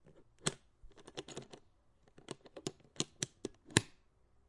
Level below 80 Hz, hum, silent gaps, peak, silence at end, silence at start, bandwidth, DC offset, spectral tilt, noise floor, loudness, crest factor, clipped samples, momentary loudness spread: -68 dBFS; none; none; -6 dBFS; 0.6 s; 0.05 s; 11.5 kHz; under 0.1%; -3 dB/octave; -69 dBFS; -41 LUFS; 38 dB; under 0.1%; 24 LU